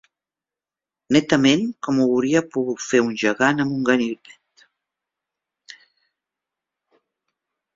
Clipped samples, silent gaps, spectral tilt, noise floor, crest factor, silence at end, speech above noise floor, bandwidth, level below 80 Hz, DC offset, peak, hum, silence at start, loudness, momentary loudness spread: under 0.1%; none; -5 dB/octave; -90 dBFS; 20 dB; 3.6 s; 70 dB; 7.8 kHz; -62 dBFS; under 0.1%; -2 dBFS; none; 1.1 s; -20 LUFS; 8 LU